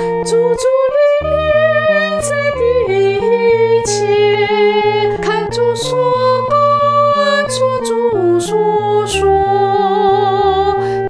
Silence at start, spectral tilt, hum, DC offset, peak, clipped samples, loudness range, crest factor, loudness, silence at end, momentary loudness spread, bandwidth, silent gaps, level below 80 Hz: 0 s; -4.5 dB/octave; none; under 0.1%; -2 dBFS; under 0.1%; 1 LU; 10 dB; -13 LUFS; 0 s; 4 LU; 11 kHz; none; -38 dBFS